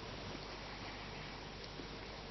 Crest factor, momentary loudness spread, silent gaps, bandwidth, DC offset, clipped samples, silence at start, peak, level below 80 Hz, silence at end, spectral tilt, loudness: 16 dB; 2 LU; none; 6 kHz; under 0.1%; under 0.1%; 0 s; -32 dBFS; -58 dBFS; 0 s; -3 dB/octave; -47 LUFS